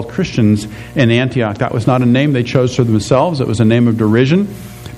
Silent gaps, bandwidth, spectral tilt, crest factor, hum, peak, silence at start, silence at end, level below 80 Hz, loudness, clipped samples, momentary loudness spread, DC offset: none; 13.5 kHz; -7 dB/octave; 12 dB; none; 0 dBFS; 0 s; 0 s; -42 dBFS; -13 LUFS; under 0.1%; 6 LU; under 0.1%